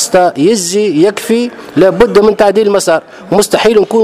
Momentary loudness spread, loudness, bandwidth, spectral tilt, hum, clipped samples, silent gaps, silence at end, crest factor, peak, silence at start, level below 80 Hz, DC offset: 6 LU; -10 LUFS; 16 kHz; -4 dB/octave; none; 0.5%; none; 0 s; 10 dB; 0 dBFS; 0 s; -40 dBFS; under 0.1%